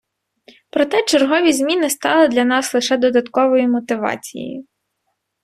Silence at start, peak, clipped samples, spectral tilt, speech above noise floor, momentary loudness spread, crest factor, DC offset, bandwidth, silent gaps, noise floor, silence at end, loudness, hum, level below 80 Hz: 0.75 s; -2 dBFS; under 0.1%; -2.5 dB/octave; 57 dB; 13 LU; 16 dB; under 0.1%; 15.5 kHz; none; -73 dBFS; 0.8 s; -16 LUFS; none; -62 dBFS